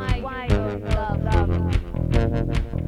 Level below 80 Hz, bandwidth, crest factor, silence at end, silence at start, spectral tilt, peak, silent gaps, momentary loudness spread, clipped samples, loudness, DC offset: -26 dBFS; 11 kHz; 16 dB; 0 s; 0 s; -7.5 dB/octave; -6 dBFS; none; 4 LU; under 0.1%; -24 LUFS; under 0.1%